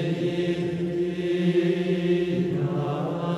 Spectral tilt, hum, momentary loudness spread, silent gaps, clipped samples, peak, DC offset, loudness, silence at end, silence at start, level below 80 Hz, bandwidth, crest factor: -8 dB/octave; none; 4 LU; none; under 0.1%; -12 dBFS; under 0.1%; -25 LUFS; 0 s; 0 s; -56 dBFS; 9.8 kHz; 12 dB